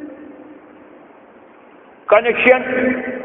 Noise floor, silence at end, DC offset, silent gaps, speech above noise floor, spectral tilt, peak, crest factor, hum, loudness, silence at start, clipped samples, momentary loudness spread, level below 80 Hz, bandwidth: -44 dBFS; 0 s; under 0.1%; none; 30 dB; -2 dB/octave; 0 dBFS; 20 dB; none; -14 LUFS; 0 s; under 0.1%; 24 LU; -58 dBFS; 3.9 kHz